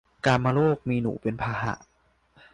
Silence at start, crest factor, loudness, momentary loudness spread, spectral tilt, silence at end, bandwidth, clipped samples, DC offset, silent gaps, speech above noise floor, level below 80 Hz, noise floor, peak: 0.25 s; 18 dB; -26 LUFS; 9 LU; -7 dB/octave; 0.75 s; 10 kHz; under 0.1%; under 0.1%; none; 38 dB; -52 dBFS; -63 dBFS; -10 dBFS